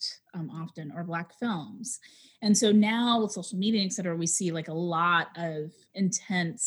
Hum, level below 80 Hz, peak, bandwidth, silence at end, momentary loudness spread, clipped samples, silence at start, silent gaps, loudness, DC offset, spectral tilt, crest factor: none; -82 dBFS; -10 dBFS; 12.5 kHz; 0 s; 15 LU; under 0.1%; 0 s; none; -28 LUFS; under 0.1%; -4 dB/octave; 18 dB